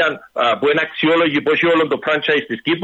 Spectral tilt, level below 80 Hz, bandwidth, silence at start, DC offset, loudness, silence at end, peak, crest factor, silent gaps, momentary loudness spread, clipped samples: -6 dB/octave; -60 dBFS; 8 kHz; 0 s; under 0.1%; -16 LUFS; 0 s; -6 dBFS; 12 dB; none; 4 LU; under 0.1%